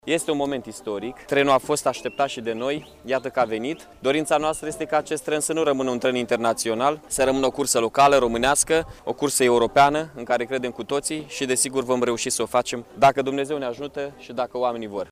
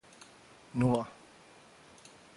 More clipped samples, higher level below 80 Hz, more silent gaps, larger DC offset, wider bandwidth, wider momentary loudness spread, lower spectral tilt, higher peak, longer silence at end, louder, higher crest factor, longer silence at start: neither; first, -52 dBFS vs -64 dBFS; neither; neither; first, 15.5 kHz vs 11.5 kHz; second, 11 LU vs 26 LU; second, -3 dB/octave vs -7.5 dB/octave; first, -6 dBFS vs -16 dBFS; second, 0.05 s vs 1.25 s; first, -23 LUFS vs -32 LUFS; about the same, 16 dB vs 20 dB; second, 0.05 s vs 0.75 s